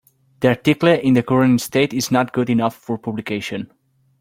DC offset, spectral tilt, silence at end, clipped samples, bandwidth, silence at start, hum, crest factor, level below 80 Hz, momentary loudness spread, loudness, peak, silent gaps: under 0.1%; -6 dB/octave; 0.55 s; under 0.1%; 16.5 kHz; 0.4 s; none; 16 dB; -56 dBFS; 11 LU; -18 LUFS; -2 dBFS; none